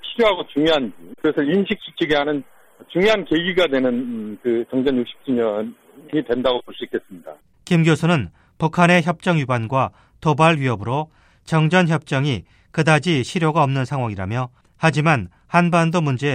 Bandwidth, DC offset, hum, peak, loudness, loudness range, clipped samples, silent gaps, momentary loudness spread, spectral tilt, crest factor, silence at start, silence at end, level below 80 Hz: 11 kHz; under 0.1%; none; 0 dBFS; -19 LUFS; 3 LU; under 0.1%; none; 11 LU; -6.5 dB/octave; 20 dB; 0.05 s; 0 s; -52 dBFS